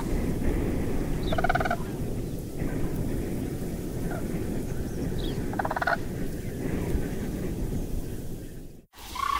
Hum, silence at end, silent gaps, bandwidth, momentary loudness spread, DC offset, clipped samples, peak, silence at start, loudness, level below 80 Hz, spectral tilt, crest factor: none; 0 s; none; 16 kHz; 9 LU; under 0.1%; under 0.1%; -10 dBFS; 0 s; -31 LUFS; -34 dBFS; -6 dB/octave; 18 dB